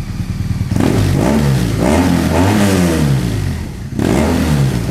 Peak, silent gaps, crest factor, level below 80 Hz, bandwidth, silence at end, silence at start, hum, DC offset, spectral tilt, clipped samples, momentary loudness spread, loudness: -2 dBFS; none; 12 dB; -26 dBFS; 16 kHz; 0 s; 0 s; none; 0.3%; -6.5 dB/octave; under 0.1%; 8 LU; -14 LUFS